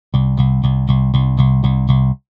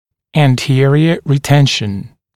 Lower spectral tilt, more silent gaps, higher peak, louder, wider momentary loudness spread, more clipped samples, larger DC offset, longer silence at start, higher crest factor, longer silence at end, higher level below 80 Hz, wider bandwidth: first, -10.5 dB/octave vs -6 dB/octave; neither; about the same, 0 dBFS vs 0 dBFS; about the same, -15 LUFS vs -13 LUFS; second, 2 LU vs 9 LU; neither; neither; second, 0.15 s vs 0.35 s; about the same, 14 dB vs 12 dB; about the same, 0.2 s vs 0.3 s; first, -24 dBFS vs -48 dBFS; second, 4.1 kHz vs 13.5 kHz